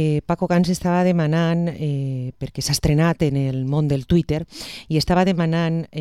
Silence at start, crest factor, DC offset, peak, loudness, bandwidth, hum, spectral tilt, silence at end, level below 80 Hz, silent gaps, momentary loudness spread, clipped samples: 0 s; 16 dB; 0.2%; -4 dBFS; -20 LUFS; 13 kHz; none; -6.5 dB/octave; 0 s; -40 dBFS; none; 8 LU; under 0.1%